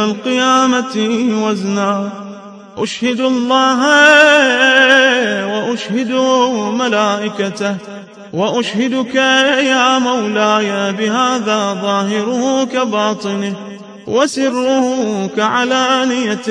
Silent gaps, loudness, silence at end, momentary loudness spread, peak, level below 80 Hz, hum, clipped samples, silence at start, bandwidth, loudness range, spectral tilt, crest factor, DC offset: none; -13 LUFS; 0 s; 12 LU; 0 dBFS; -64 dBFS; none; under 0.1%; 0 s; 10.5 kHz; 6 LU; -3.5 dB/octave; 14 dB; under 0.1%